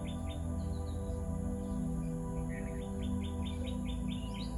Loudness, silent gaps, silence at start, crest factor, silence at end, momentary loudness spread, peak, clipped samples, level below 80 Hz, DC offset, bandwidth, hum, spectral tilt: -39 LUFS; none; 0 s; 10 dB; 0 s; 2 LU; -26 dBFS; under 0.1%; -42 dBFS; under 0.1%; 12 kHz; none; -7 dB/octave